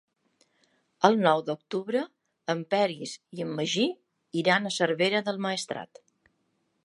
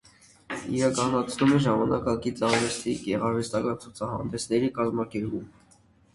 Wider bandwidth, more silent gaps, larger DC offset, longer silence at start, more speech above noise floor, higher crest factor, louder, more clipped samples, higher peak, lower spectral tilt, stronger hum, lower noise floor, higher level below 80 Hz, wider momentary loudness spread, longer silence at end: about the same, 11.5 kHz vs 11.5 kHz; neither; neither; first, 1 s vs 0.5 s; first, 47 dB vs 33 dB; first, 26 dB vs 18 dB; about the same, -27 LUFS vs -27 LUFS; neither; first, -2 dBFS vs -10 dBFS; about the same, -4.5 dB/octave vs -5.5 dB/octave; neither; first, -74 dBFS vs -60 dBFS; second, -82 dBFS vs -54 dBFS; first, 14 LU vs 10 LU; first, 1 s vs 0.65 s